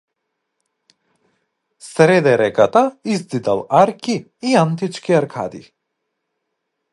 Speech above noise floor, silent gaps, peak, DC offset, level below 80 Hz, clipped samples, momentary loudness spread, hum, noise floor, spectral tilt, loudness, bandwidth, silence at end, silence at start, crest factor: 60 dB; none; 0 dBFS; under 0.1%; -62 dBFS; under 0.1%; 11 LU; none; -75 dBFS; -6 dB/octave; -16 LUFS; 11.5 kHz; 1.3 s; 1.85 s; 18 dB